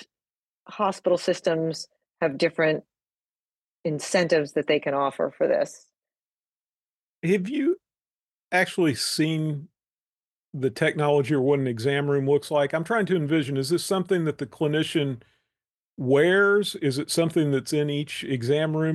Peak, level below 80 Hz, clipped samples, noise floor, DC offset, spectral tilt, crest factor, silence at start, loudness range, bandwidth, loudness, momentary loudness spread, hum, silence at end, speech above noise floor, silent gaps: -8 dBFS; -70 dBFS; under 0.1%; under -90 dBFS; under 0.1%; -5.5 dB/octave; 18 dB; 0 s; 4 LU; 12.5 kHz; -24 LUFS; 9 LU; none; 0 s; over 66 dB; 0.35-0.64 s, 3.14-3.84 s, 6.27-7.22 s, 8.11-8.43 s, 9.92-10.16 s, 10.25-10.43 s, 15.76-15.97 s